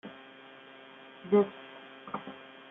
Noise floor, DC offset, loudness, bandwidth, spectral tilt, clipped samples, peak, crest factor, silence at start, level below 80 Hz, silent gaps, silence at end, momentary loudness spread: -52 dBFS; under 0.1%; -31 LUFS; 3.8 kHz; -5.5 dB/octave; under 0.1%; -14 dBFS; 22 dB; 0.05 s; -82 dBFS; none; 0.05 s; 23 LU